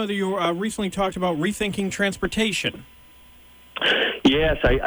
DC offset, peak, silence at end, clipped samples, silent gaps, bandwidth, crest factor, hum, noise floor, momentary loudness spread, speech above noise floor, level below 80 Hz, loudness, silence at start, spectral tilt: under 0.1%; -8 dBFS; 0 s; under 0.1%; none; over 20 kHz; 16 dB; none; -49 dBFS; 7 LU; 27 dB; -36 dBFS; -22 LUFS; 0 s; -4.5 dB/octave